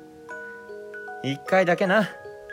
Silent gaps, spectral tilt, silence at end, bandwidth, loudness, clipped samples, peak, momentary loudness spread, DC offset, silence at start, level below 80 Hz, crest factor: none; -6 dB/octave; 0 s; 16 kHz; -23 LUFS; under 0.1%; -8 dBFS; 19 LU; under 0.1%; 0 s; -70 dBFS; 18 dB